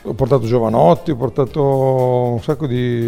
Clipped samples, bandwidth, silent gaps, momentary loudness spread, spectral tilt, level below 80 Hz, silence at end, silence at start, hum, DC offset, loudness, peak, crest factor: under 0.1%; 15 kHz; none; 6 LU; -9 dB/octave; -42 dBFS; 0 s; 0.05 s; none; under 0.1%; -16 LUFS; 0 dBFS; 16 dB